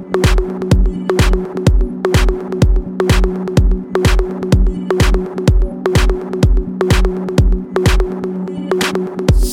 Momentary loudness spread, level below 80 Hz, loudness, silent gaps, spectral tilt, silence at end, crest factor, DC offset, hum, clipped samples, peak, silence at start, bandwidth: 3 LU; -16 dBFS; -16 LUFS; none; -6 dB/octave; 0 s; 12 dB; under 0.1%; none; under 0.1%; 0 dBFS; 0 s; 15 kHz